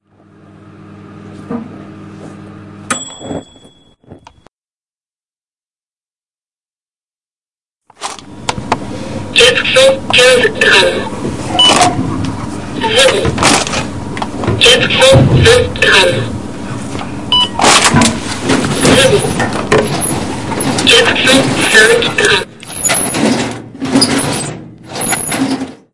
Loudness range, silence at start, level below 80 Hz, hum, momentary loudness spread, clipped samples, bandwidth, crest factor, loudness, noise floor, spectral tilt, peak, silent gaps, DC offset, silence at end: 17 LU; 0.25 s; -36 dBFS; none; 17 LU; 0.4%; 12 kHz; 12 dB; -10 LUFS; under -90 dBFS; -3 dB/octave; 0 dBFS; 4.51-4.62 s, 6.30-6.34 s, 7.04-7.08 s; 2%; 0.1 s